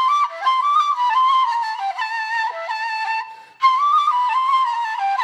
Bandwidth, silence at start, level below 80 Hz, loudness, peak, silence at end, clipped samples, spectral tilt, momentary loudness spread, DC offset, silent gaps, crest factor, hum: 10.5 kHz; 0 s; under -90 dBFS; -19 LUFS; -4 dBFS; 0 s; under 0.1%; 3 dB/octave; 8 LU; under 0.1%; none; 14 dB; none